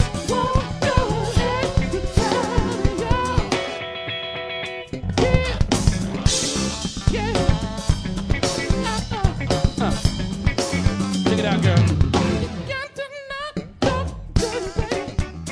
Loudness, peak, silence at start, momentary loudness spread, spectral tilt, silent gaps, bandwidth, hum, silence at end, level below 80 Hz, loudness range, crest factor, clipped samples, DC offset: -22 LUFS; -2 dBFS; 0 s; 8 LU; -5 dB/octave; none; 11 kHz; none; 0 s; -28 dBFS; 2 LU; 20 dB; under 0.1%; under 0.1%